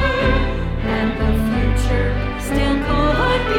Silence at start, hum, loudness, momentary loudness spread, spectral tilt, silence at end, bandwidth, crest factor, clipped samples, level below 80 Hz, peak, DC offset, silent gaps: 0 s; none; -19 LUFS; 5 LU; -6.5 dB/octave; 0 s; 16 kHz; 12 dB; under 0.1%; -22 dBFS; -4 dBFS; under 0.1%; none